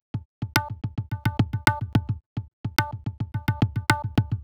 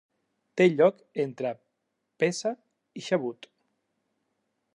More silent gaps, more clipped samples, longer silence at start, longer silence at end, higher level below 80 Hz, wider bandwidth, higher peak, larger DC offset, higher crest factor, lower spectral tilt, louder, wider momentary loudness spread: first, 0.25-0.42 s, 2.26-2.36 s, 2.53-2.64 s vs none; neither; second, 0.15 s vs 0.55 s; second, 0 s vs 1.4 s; first, -44 dBFS vs -84 dBFS; first, over 20 kHz vs 11.5 kHz; first, -2 dBFS vs -8 dBFS; neither; about the same, 24 dB vs 20 dB; about the same, -5 dB/octave vs -5.5 dB/octave; about the same, -27 LUFS vs -27 LUFS; second, 10 LU vs 22 LU